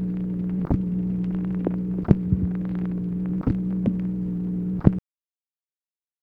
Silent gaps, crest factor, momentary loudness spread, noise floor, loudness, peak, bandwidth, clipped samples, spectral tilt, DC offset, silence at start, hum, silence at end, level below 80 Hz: none; 24 dB; 6 LU; under -90 dBFS; -25 LUFS; 0 dBFS; 3.2 kHz; under 0.1%; -12 dB/octave; under 0.1%; 0 s; none; 1.25 s; -38 dBFS